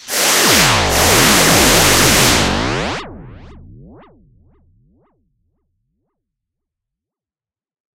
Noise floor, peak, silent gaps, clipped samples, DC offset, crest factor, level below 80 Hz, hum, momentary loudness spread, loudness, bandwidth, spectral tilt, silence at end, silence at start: under -90 dBFS; 0 dBFS; none; under 0.1%; under 0.1%; 16 dB; -32 dBFS; none; 11 LU; -10 LUFS; 16 kHz; -2 dB/octave; 4.45 s; 0.05 s